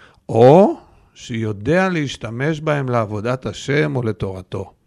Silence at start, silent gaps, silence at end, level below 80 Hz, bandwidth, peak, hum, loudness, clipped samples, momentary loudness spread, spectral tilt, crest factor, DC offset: 0.3 s; none; 0.15 s; -48 dBFS; 11 kHz; 0 dBFS; none; -18 LUFS; under 0.1%; 16 LU; -7 dB/octave; 18 dB; under 0.1%